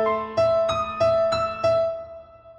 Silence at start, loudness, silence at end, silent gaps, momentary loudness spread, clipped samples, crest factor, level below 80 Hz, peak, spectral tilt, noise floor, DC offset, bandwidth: 0 s; -22 LUFS; 0.05 s; none; 7 LU; under 0.1%; 12 dB; -50 dBFS; -10 dBFS; -5 dB/octave; -43 dBFS; under 0.1%; 9 kHz